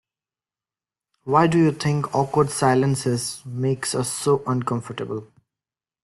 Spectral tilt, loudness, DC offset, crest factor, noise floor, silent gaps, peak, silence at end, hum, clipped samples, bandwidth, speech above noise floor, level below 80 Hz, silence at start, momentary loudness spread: -5.5 dB/octave; -22 LUFS; under 0.1%; 20 dB; under -90 dBFS; none; -4 dBFS; 0.8 s; none; under 0.1%; 12.5 kHz; over 69 dB; -58 dBFS; 1.25 s; 12 LU